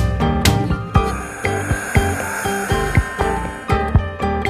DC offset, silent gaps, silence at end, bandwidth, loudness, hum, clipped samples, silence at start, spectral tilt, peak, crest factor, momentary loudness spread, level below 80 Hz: under 0.1%; none; 0 s; 14 kHz; -19 LUFS; none; under 0.1%; 0 s; -5.5 dB/octave; 0 dBFS; 18 dB; 5 LU; -26 dBFS